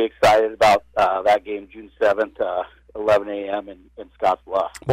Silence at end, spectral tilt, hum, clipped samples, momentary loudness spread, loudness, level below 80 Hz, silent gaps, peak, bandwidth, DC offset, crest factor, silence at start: 0 s; -4.5 dB/octave; none; under 0.1%; 15 LU; -20 LUFS; -50 dBFS; none; -8 dBFS; 16 kHz; under 0.1%; 12 dB; 0 s